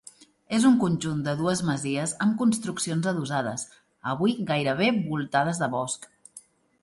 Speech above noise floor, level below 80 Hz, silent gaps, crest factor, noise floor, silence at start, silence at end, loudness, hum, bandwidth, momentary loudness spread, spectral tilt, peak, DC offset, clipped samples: 27 dB; -64 dBFS; none; 18 dB; -52 dBFS; 0.5 s; 0.45 s; -26 LUFS; none; 11.5 kHz; 10 LU; -5 dB/octave; -8 dBFS; under 0.1%; under 0.1%